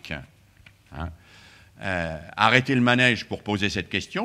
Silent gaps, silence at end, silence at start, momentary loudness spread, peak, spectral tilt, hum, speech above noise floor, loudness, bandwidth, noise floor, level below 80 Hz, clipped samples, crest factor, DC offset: none; 0 s; 0.05 s; 18 LU; 0 dBFS; -5 dB/octave; none; 30 dB; -22 LUFS; 13 kHz; -54 dBFS; -52 dBFS; under 0.1%; 24 dB; under 0.1%